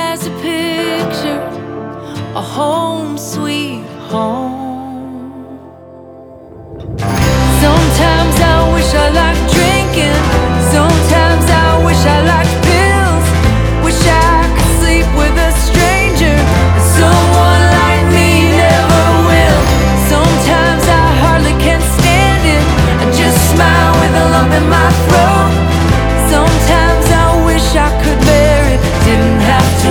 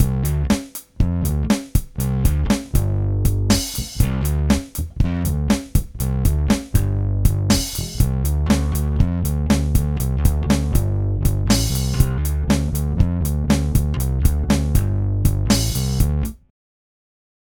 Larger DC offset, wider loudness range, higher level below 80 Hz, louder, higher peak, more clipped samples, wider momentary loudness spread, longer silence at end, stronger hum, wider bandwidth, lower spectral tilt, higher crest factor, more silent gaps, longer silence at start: neither; first, 10 LU vs 1 LU; first, -16 dBFS vs -22 dBFS; first, -10 LUFS vs -20 LUFS; about the same, 0 dBFS vs -2 dBFS; neither; first, 11 LU vs 4 LU; second, 0 s vs 1.15 s; neither; about the same, 19.5 kHz vs 19.5 kHz; about the same, -5 dB/octave vs -5.5 dB/octave; second, 10 dB vs 16 dB; neither; about the same, 0 s vs 0 s